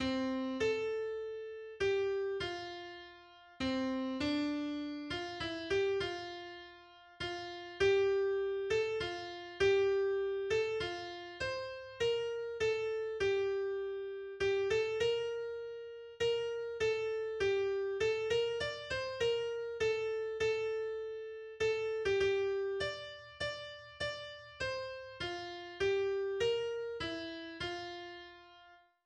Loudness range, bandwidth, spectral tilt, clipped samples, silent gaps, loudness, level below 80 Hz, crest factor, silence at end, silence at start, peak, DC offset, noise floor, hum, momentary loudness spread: 4 LU; 9.4 kHz; -4.5 dB/octave; under 0.1%; none; -36 LUFS; -62 dBFS; 16 dB; 0.3 s; 0 s; -20 dBFS; under 0.1%; -62 dBFS; none; 12 LU